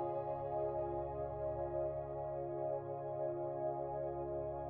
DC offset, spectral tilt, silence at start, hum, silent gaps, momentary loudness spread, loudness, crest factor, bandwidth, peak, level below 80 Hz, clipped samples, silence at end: under 0.1%; -10 dB/octave; 0 s; none; none; 3 LU; -41 LUFS; 12 dB; 3.6 kHz; -28 dBFS; -60 dBFS; under 0.1%; 0 s